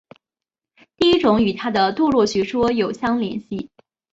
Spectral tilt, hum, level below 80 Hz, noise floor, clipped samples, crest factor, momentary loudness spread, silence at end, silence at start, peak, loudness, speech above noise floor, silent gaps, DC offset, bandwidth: -5.5 dB/octave; none; -50 dBFS; -89 dBFS; under 0.1%; 18 dB; 13 LU; 0.45 s; 1 s; -2 dBFS; -19 LUFS; 70 dB; none; under 0.1%; 8 kHz